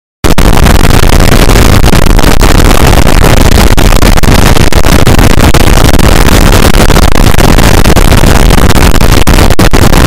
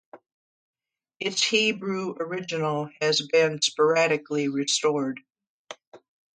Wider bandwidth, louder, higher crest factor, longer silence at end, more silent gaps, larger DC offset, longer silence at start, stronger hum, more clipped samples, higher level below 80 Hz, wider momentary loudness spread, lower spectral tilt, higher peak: first, 17 kHz vs 9.4 kHz; first, -5 LUFS vs -24 LUFS; second, 2 dB vs 18 dB; second, 0 s vs 0.4 s; second, none vs 0.34-0.73 s, 5.49-5.65 s, 5.87-5.92 s; neither; about the same, 0.25 s vs 0.15 s; neither; first, 3% vs under 0.1%; first, -4 dBFS vs -76 dBFS; second, 1 LU vs 15 LU; first, -5 dB/octave vs -3 dB/octave; first, 0 dBFS vs -8 dBFS